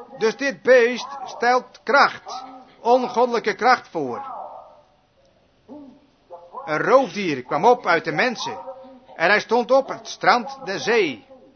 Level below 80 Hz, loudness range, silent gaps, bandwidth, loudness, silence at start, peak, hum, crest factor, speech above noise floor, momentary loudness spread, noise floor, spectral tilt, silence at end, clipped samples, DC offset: -68 dBFS; 6 LU; none; 6.6 kHz; -20 LUFS; 0 s; 0 dBFS; none; 20 dB; 39 dB; 17 LU; -59 dBFS; -4 dB/octave; 0.2 s; under 0.1%; under 0.1%